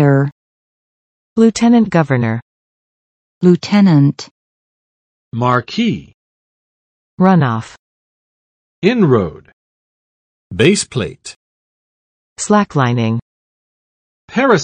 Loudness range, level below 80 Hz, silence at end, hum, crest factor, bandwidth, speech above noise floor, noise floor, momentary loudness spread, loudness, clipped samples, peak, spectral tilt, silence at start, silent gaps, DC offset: 5 LU; -54 dBFS; 0 s; none; 16 dB; 10 kHz; over 77 dB; under -90 dBFS; 14 LU; -14 LUFS; under 0.1%; 0 dBFS; -6.5 dB/octave; 0 s; 0.32-1.36 s, 2.42-3.41 s, 4.31-5.31 s, 6.14-7.17 s, 7.79-8.82 s, 9.53-10.50 s, 11.36-12.36 s, 13.22-14.28 s; under 0.1%